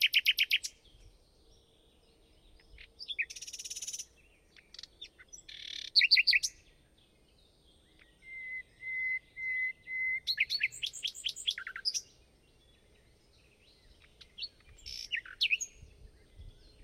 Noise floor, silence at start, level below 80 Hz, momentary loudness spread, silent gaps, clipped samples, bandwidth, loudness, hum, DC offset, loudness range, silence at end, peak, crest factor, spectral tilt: -66 dBFS; 0 s; -64 dBFS; 22 LU; none; under 0.1%; 16 kHz; -31 LUFS; none; under 0.1%; 12 LU; 0.15 s; -12 dBFS; 24 dB; 2.5 dB/octave